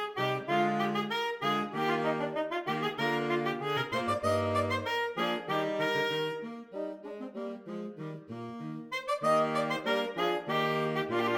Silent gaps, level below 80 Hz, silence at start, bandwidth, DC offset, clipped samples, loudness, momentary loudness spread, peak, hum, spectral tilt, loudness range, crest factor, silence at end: none; -74 dBFS; 0 s; 18 kHz; under 0.1%; under 0.1%; -31 LUFS; 12 LU; -14 dBFS; none; -5.5 dB/octave; 5 LU; 16 dB; 0 s